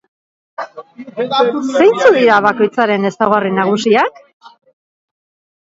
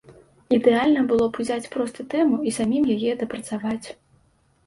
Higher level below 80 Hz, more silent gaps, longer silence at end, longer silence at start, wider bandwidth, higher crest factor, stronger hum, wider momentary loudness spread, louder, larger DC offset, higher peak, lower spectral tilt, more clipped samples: about the same, -62 dBFS vs -58 dBFS; first, 4.33-4.40 s vs none; first, 1.15 s vs 0.75 s; first, 0.6 s vs 0.1 s; second, 7.8 kHz vs 11.5 kHz; about the same, 14 dB vs 18 dB; neither; first, 19 LU vs 10 LU; first, -12 LUFS vs -22 LUFS; neither; first, 0 dBFS vs -4 dBFS; about the same, -5 dB/octave vs -5.5 dB/octave; neither